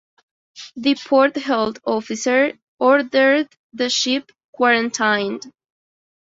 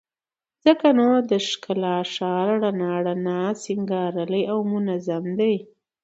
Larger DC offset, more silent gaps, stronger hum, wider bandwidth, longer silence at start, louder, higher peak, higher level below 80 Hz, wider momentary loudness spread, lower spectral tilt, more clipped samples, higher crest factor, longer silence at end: neither; first, 2.62-2.78 s, 3.59-3.70 s, 4.44-4.53 s vs none; neither; about the same, 7.8 kHz vs 8.2 kHz; about the same, 0.55 s vs 0.65 s; first, -18 LUFS vs -22 LUFS; about the same, -2 dBFS vs -2 dBFS; first, -64 dBFS vs -70 dBFS; about the same, 10 LU vs 8 LU; second, -2.5 dB/octave vs -6 dB/octave; neither; about the same, 18 dB vs 20 dB; first, 0.7 s vs 0.4 s